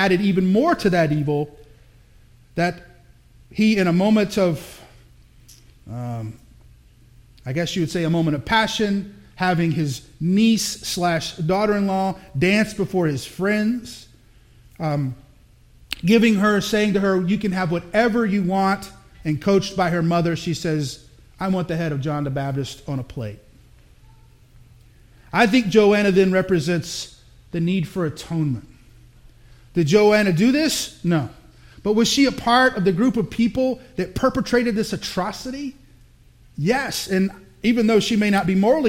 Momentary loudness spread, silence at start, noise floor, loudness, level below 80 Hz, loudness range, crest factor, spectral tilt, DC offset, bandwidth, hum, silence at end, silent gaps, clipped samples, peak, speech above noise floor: 14 LU; 0 s; -51 dBFS; -20 LUFS; -48 dBFS; 7 LU; 20 dB; -5.5 dB/octave; under 0.1%; 16.5 kHz; none; 0 s; none; under 0.1%; -2 dBFS; 31 dB